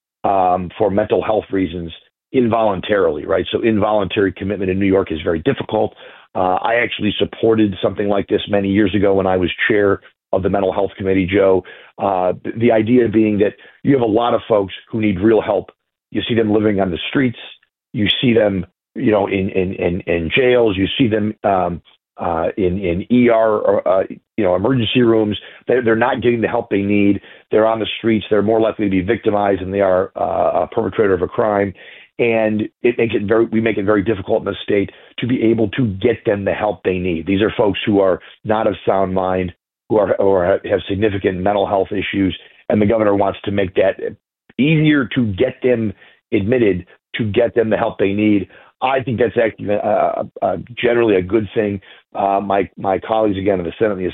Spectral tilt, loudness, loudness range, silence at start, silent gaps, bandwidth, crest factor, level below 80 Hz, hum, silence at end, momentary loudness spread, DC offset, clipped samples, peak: -11 dB/octave; -17 LUFS; 2 LU; 0.25 s; none; 4.1 kHz; 14 dB; -48 dBFS; none; 0 s; 7 LU; under 0.1%; under 0.1%; -2 dBFS